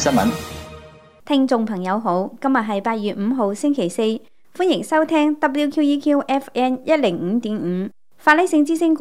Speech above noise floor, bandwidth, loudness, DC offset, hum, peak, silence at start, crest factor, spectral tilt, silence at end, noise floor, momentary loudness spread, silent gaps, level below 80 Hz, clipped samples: 25 dB; 16 kHz; -19 LUFS; 0.5%; none; 0 dBFS; 0 s; 20 dB; -5 dB/octave; 0 s; -44 dBFS; 7 LU; none; -54 dBFS; under 0.1%